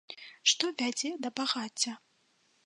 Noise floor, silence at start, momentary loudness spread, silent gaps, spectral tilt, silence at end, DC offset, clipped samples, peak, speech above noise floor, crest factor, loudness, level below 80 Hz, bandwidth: -71 dBFS; 0.1 s; 9 LU; none; 0 dB/octave; 0.65 s; under 0.1%; under 0.1%; -10 dBFS; 38 dB; 24 dB; -31 LUFS; -90 dBFS; 11.5 kHz